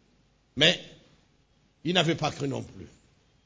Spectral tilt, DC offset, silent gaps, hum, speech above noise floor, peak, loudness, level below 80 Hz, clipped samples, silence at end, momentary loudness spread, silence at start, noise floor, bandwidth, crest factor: -4 dB/octave; under 0.1%; none; none; 39 dB; -8 dBFS; -26 LUFS; -60 dBFS; under 0.1%; 0.6 s; 21 LU; 0.55 s; -65 dBFS; 8 kHz; 24 dB